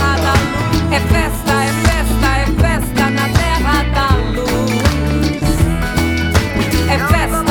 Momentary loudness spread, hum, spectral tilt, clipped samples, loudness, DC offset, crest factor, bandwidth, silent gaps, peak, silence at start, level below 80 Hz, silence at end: 2 LU; none; -5.5 dB/octave; under 0.1%; -15 LUFS; under 0.1%; 12 dB; over 20 kHz; none; 0 dBFS; 0 s; -20 dBFS; 0 s